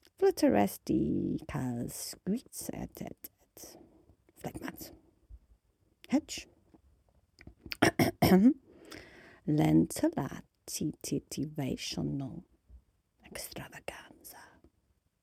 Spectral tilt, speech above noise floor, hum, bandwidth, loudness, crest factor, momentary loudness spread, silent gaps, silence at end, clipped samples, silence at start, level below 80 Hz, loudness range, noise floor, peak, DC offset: -5.5 dB/octave; 43 dB; none; 16.5 kHz; -32 LUFS; 26 dB; 23 LU; none; 0.8 s; under 0.1%; 0.2 s; -58 dBFS; 14 LU; -75 dBFS; -8 dBFS; under 0.1%